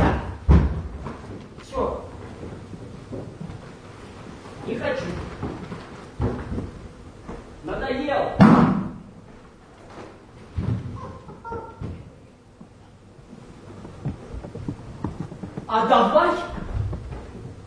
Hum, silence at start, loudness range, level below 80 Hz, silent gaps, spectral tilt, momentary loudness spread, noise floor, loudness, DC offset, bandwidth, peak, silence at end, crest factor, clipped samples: none; 0 s; 15 LU; -34 dBFS; none; -8 dB/octave; 23 LU; -48 dBFS; -24 LUFS; under 0.1%; 10.5 kHz; -2 dBFS; 0 s; 24 dB; under 0.1%